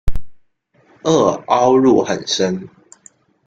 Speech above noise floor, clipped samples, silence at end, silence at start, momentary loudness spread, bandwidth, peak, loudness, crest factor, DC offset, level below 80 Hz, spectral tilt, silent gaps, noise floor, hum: 41 dB; under 0.1%; 0.8 s; 0.05 s; 16 LU; 9 kHz; 0 dBFS; -15 LUFS; 16 dB; under 0.1%; -32 dBFS; -5 dB/octave; none; -56 dBFS; none